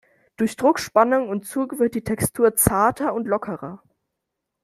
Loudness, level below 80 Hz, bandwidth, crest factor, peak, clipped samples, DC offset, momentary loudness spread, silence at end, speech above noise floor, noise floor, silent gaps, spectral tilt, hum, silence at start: -21 LUFS; -48 dBFS; 15.5 kHz; 20 dB; -2 dBFS; under 0.1%; under 0.1%; 9 LU; 0.85 s; 60 dB; -81 dBFS; none; -5 dB/octave; none; 0.4 s